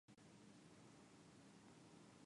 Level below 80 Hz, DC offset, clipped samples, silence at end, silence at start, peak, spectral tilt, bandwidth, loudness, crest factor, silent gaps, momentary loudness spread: -90 dBFS; under 0.1%; under 0.1%; 0 s; 0.1 s; -52 dBFS; -4.5 dB/octave; 11 kHz; -66 LUFS; 14 dB; none; 1 LU